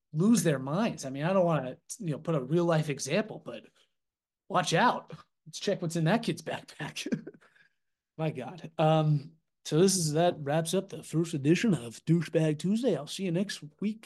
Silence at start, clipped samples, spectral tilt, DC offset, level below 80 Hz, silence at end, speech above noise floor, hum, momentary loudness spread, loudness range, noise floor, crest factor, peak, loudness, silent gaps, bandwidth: 0.15 s; under 0.1%; -5.5 dB/octave; under 0.1%; -72 dBFS; 0.1 s; 60 dB; none; 13 LU; 5 LU; -89 dBFS; 18 dB; -12 dBFS; -29 LUFS; none; 12.5 kHz